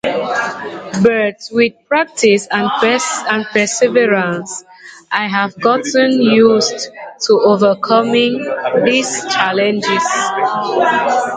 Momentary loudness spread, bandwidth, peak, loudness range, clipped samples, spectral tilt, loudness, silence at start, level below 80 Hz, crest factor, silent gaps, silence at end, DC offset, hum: 8 LU; 9.4 kHz; 0 dBFS; 2 LU; under 0.1%; -3.5 dB/octave; -14 LUFS; 0.05 s; -58 dBFS; 14 dB; none; 0 s; under 0.1%; none